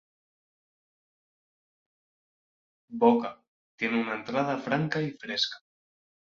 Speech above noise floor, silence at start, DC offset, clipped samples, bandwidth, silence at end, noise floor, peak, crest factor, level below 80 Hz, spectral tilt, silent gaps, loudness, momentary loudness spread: over 63 dB; 2.9 s; under 0.1%; under 0.1%; 7.4 kHz; 0.8 s; under -90 dBFS; -8 dBFS; 24 dB; -74 dBFS; -5.5 dB/octave; 3.48-3.78 s; -28 LUFS; 11 LU